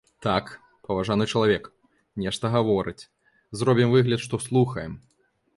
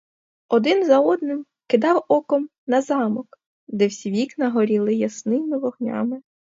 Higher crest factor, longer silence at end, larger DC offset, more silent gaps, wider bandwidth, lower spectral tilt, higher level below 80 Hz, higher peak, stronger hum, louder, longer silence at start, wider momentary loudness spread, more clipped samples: about the same, 18 dB vs 18 dB; first, 0.6 s vs 0.35 s; neither; second, none vs 2.58-2.67 s, 3.46-3.67 s; first, 11.5 kHz vs 7.8 kHz; about the same, -6 dB/octave vs -6 dB/octave; first, -54 dBFS vs -72 dBFS; second, -8 dBFS vs -4 dBFS; neither; second, -24 LUFS vs -21 LUFS; second, 0.2 s vs 0.5 s; first, 19 LU vs 10 LU; neither